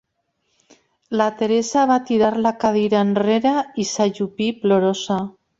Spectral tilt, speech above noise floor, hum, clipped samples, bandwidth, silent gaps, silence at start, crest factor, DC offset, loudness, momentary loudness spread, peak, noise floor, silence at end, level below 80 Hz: -5 dB/octave; 53 dB; none; under 0.1%; 8 kHz; none; 1.1 s; 16 dB; under 0.1%; -19 LUFS; 6 LU; -4 dBFS; -71 dBFS; 0.3 s; -60 dBFS